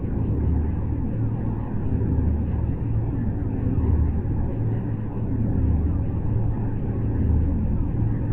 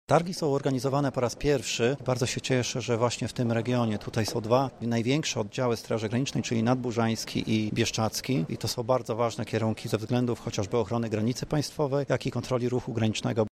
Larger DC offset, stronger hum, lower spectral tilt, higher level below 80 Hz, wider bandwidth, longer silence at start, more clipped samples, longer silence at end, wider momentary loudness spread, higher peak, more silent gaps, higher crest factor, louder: neither; neither; first, -13 dB/octave vs -5.5 dB/octave; first, -26 dBFS vs -54 dBFS; second, 2.9 kHz vs 15 kHz; about the same, 0 s vs 0.1 s; neither; about the same, 0 s vs 0.05 s; about the same, 4 LU vs 3 LU; about the same, -10 dBFS vs -8 dBFS; neither; second, 12 dB vs 20 dB; first, -25 LUFS vs -28 LUFS